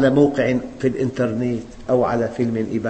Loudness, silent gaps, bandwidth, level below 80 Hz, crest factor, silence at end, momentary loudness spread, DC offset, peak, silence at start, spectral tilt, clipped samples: -21 LUFS; none; 8.6 kHz; -46 dBFS; 16 dB; 0 s; 7 LU; under 0.1%; -2 dBFS; 0 s; -7.5 dB/octave; under 0.1%